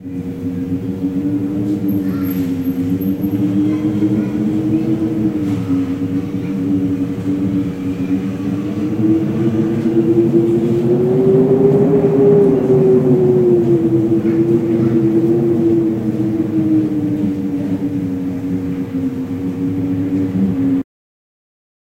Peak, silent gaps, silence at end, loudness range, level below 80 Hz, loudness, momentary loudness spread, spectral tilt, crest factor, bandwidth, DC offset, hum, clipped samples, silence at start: 0 dBFS; none; 1 s; 7 LU; -46 dBFS; -16 LUFS; 9 LU; -9.5 dB/octave; 14 dB; 15.5 kHz; under 0.1%; none; under 0.1%; 0 s